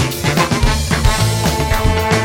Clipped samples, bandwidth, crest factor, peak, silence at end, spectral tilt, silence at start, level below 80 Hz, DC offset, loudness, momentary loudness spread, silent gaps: under 0.1%; 17.5 kHz; 14 dB; 0 dBFS; 0 s; -4.5 dB/octave; 0 s; -20 dBFS; under 0.1%; -15 LUFS; 2 LU; none